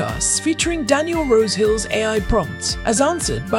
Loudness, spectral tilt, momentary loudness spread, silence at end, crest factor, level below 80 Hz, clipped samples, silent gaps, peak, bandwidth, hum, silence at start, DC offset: -18 LUFS; -3.5 dB/octave; 4 LU; 0 s; 16 dB; -32 dBFS; under 0.1%; none; -2 dBFS; 16.5 kHz; none; 0 s; under 0.1%